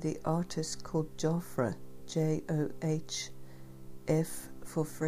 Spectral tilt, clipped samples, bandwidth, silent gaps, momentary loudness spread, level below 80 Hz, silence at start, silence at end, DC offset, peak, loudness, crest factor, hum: -6 dB/octave; under 0.1%; 15.5 kHz; none; 13 LU; -56 dBFS; 0 s; 0 s; 0.5%; -16 dBFS; -35 LUFS; 18 dB; none